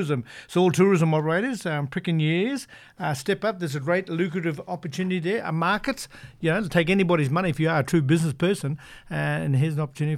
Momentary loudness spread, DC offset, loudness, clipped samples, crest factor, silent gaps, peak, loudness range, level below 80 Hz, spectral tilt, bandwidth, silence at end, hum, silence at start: 10 LU; under 0.1%; -24 LUFS; under 0.1%; 18 dB; none; -6 dBFS; 3 LU; -56 dBFS; -6.5 dB/octave; 14.5 kHz; 0 s; none; 0 s